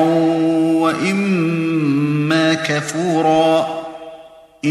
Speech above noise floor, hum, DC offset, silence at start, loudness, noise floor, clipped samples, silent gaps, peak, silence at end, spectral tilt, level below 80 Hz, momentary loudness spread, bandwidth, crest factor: 25 dB; none; under 0.1%; 0 s; -16 LUFS; -41 dBFS; under 0.1%; none; -2 dBFS; 0 s; -6 dB/octave; -58 dBFS; 10 LU; 12.5 kHz; 14 dB